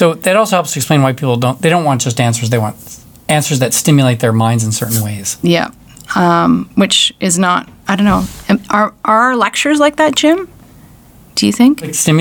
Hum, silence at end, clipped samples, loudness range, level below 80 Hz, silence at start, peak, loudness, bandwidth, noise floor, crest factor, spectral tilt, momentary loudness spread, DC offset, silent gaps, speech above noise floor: none; 0 s; under 0.1%; 1 LU; -42 dBFS; 0 s; 0 dBFS; -12 LUFS; over 20 kHz; -41 dBFS; 12 dB; -4.5 dB/octave; 7 LU; under 0.1%; none; 29 dB